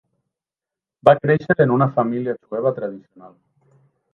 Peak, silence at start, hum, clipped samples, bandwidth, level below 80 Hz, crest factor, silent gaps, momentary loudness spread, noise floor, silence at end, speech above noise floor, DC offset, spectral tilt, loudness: 0 dBFS; 1.05 s; none; under 0.1%; 5.8 kHz; -60 dBFS; 20 dB; none; 13 LU; -89 dBFS; 0.85 s; 70 dB; under 0.1%; -9.5 dB/octave; -19 LUFS